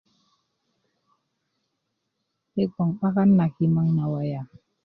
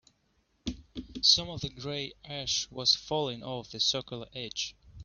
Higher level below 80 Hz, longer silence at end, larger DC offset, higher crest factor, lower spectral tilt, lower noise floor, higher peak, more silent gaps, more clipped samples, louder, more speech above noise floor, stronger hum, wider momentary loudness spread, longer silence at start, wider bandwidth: second, -62 dBFS vs -56 dBFS; first, 0.4 s vs 0 s; neither; second, 16 dB vs 24 dB; first, -12 dB/octave vs -2 dB/octave; first, -78 dBFS vs -72 dBFS; about the same, -10 dBFS vs -10 dBFS; neither; neither; first, -23 LUFS vs -29 LUFS; first, 56 dB vs 41 dB; neither; second, 14 LU vs 17 LU; first, 2.55 s vs 0.65 s; second, 4.8 kHz vs 7.2 kHz